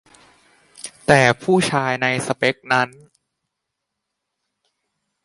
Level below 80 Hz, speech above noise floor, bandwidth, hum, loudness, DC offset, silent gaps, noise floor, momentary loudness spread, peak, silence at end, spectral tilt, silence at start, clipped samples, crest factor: -56 dBFS; 62 dB; 11.5 kHz; none; -18 LUFS; under 0.1%; none; -80 dBFS; 12 LU; 0 dBFS; 2.35 s; -4.5 dB/octave; 0.85 s; under 0.1%; 22 dB